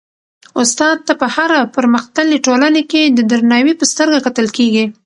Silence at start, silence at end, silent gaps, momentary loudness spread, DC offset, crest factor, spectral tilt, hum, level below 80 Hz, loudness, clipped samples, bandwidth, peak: 0.55 s; 0.15 s; none; 4 LU; under 0.1%; 12 dB; -3 dB/octave; none; -60 dBFS; -12 LUFS; under 0.1%; 11.5 kHz; 0 dBFS